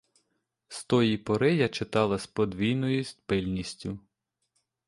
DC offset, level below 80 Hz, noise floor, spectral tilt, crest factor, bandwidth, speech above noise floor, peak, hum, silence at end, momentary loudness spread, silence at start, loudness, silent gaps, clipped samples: under 0.1%; -56 dBFS; -79 dBFS; -6 dB/octave; 20 dB; 11.5 kHz; 51 dB; -10 dBFS; none; 0.9 s; 14 LU; 0.7 s; -28 LUFS; none; under 0.1%